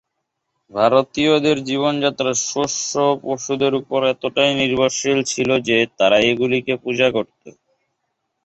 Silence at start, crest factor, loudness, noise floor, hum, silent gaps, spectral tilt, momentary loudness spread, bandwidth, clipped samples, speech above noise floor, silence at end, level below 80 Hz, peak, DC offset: 0.75 s; 18 dB; -18 LUFS; -76 dBFS; none; none; -3.5 dB/octave; 5 LU; 8.4 kHz; under 0.1%; 58 dB; 0.95 s; -56 dBFS; -2 dBFS; under 0.1%